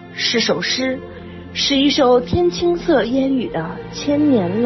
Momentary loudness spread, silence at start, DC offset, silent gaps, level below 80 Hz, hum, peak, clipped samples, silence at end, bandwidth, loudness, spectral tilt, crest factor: 13 LU; 0 s; under 0.1%; none; -42 dBFS; none; -4 dBFS; under 0.1%; 0 s; 6.2 kHz; -17 LUFS; -4.5 dB/octave; 14 dB